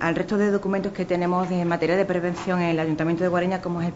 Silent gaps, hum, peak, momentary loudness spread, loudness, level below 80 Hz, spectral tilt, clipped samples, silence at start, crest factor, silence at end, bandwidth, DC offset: none; none; -8 dBFS; 4 LU; -24 LUFS; -54 dBFS; -7.5 dB/octave; under 0.1%; 0 s; 16 dB; 0 s; 8 kHz; 0.1%